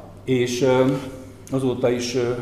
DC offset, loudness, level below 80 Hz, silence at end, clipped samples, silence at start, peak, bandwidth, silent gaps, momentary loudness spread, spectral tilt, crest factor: 0.1%; -22 LUFS; -50 dBFS; 0 s; under 0.1%; 0 s; -6 dBFS; 13.5 kHz; none; 10 LU; -5.5 dB/octave; 14 dB